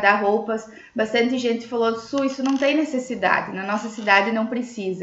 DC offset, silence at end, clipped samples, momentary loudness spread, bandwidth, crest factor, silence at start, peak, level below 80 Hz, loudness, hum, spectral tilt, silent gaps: under 0.1%; 0 s; under 0.1%; 9 LU; 8 kHz; 20 dB; 0 s; -2 dBFS; -64 dBFS; -22 LUFS; none; -4.5 dB/octave; none